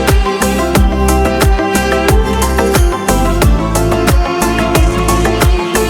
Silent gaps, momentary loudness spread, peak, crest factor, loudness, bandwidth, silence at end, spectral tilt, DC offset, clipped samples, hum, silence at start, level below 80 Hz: none; 2 LU; 0 dBFS; 10 dB; -12 LUFS; 17.5 kHz; 0 s; -5 dB/octave; under 0.1%; under 0.1%; none; 0 s; -14 dBFS